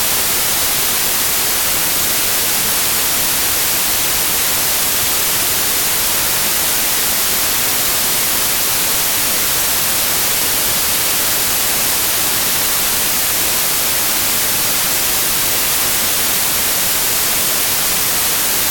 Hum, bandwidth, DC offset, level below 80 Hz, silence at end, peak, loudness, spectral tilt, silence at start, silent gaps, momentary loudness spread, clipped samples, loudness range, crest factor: none; 17.5 kHz; under 0.1%; -40 dBFS; 0 s; -2 dBFS; -12 LUFS; 0 dB/octave; 0 s; none; 0 LU; under 0.1%; 0 LU; 14 dB